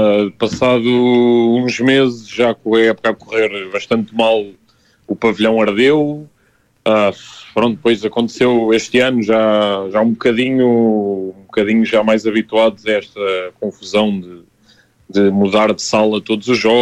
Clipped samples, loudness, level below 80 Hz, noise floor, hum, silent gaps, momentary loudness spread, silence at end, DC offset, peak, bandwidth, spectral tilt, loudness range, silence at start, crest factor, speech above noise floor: under 0.1%; -15 LUFS; -54 dBFS; -57 dBFS; none; none; 8 LU; 0 s; under 0.1%; 0 dBFS; 10 kHz; -5.5 dB/octave; 3 LU; 0 s; 14 dB; 43 dB